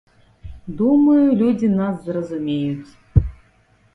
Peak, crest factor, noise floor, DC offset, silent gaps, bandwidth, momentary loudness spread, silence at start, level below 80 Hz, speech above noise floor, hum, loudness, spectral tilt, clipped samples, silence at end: 0 dBFS; 18 dB; -56 dBFS; under 0.1%; none; 6.2 kHz; 18 LU; 0.45 s; -34 dBFS; 39 dB; none; -18 LUFS; -10 dB/octave; under 0.1%; 0.6 s